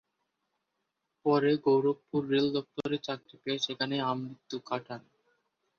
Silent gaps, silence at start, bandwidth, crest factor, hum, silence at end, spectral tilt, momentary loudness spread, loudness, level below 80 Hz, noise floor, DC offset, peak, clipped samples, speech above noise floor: none; 1.25 s; 7 kHz; 18 dB; none; 0.8 s; -6 dB/octave; 13 LU; -31 LUFS; -74 dBFS; -83 dBFS; under 0.1%; -14 dBFS; under 0.1%; 53 dB